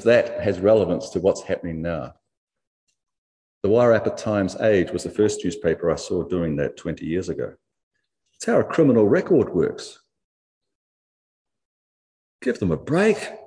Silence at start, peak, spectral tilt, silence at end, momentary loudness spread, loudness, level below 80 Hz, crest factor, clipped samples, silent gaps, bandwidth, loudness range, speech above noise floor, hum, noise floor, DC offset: 0 s; -4 dBFS; -6.5 dB/octave; 0.05 s; 12 LU; -22 LUFS; -52 dBFS; 18 dB; under 0.1%; 2.37-2.47 s, 2.67-2.87 s, 3.18-3.61 s, 7.83-7.91 s, 10.24-10.61 s, 10.75-11.45 s, 11.65-12.39 s; 10.5 kHz; 5 LU; 34 dB; none; -55 dBFS; under 0.1%